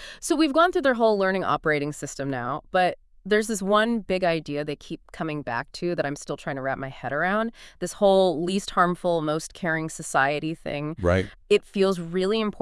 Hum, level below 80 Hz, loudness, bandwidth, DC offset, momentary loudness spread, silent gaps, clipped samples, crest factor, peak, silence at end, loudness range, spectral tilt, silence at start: none; -52 dBFS; -25 LUFS; 12 kHz; under 0.1%; 11 LU; none; under 0.1%; 18 dB; -6 dBFS; 0 s; 5 LU; -5 dB/octave; 0 s